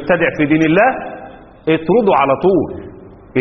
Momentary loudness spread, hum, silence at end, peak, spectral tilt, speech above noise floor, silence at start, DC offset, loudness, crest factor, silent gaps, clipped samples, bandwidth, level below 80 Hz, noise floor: 15 LU; none; 0 s; 0 dBFS; -5 dB/octave; 23 dB; 0 s; under 0.1%; -14 LUFS; 14 dB; none; under 0.1%; 6.2 kHz; -46 dBFS; -36 dBFS